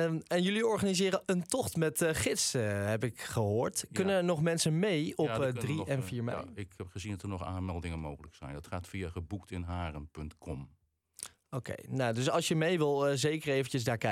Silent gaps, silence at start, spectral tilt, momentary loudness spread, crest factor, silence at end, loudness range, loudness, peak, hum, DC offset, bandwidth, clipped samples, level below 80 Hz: none; 0 s; -5 dB/octave; 14 LU; 16 dB; 0 s; 10 LU; -33 LUFS; -18 dBFS; none; under 0.1%; 17 kHz; under 0.1%; -60 dBFS